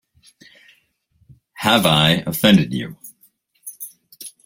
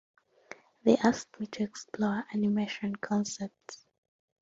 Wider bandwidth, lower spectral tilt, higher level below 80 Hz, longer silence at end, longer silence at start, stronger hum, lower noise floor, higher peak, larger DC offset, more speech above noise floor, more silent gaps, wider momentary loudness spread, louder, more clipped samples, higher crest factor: first, 16.5 kHz vs 7.8 kHz; about the same, -4.5 dB/octave vs -5.5 dB/octave; first, -52 dBFS vs -70 dBFS; second, 0.15 s vs 0.65 s; first, 1.6 s vs 0.85 s; neither; first, -62 dBFS vs -53 dBFS; first, 0 dBFS vs -10 dBFS; neither; first, 46 dB vs 23 dB; neither; about the same, 23 LU vs 24 LU; first, -16 LUFS vs -31 LUFS; neither; about the same, 20 dB vs 22 dB